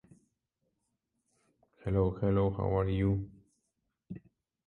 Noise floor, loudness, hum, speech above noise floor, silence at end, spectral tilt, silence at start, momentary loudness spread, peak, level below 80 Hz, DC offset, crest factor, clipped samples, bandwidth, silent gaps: -83 dBFS; -31 LUFS; none; 53 dB; 0.5 s; -10.5 dB/octave; 1.85 s; 19 LU; -18 dBFS; -48 dBFS; under 0.1%; 18 dB; under 0.1%; 4.2 kHz; none